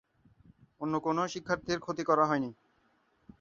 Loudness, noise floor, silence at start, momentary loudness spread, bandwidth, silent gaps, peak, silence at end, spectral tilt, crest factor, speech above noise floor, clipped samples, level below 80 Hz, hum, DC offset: -32 LUFS; -71 dBFS; 0.8 s; 8 LU; 7.6 kHz; none; -12 dBFS; 0.9 s; -5.5 dB/octave; 22 dB; 40 dB; under 0.1%; -66 dBFS; none; under 0.1%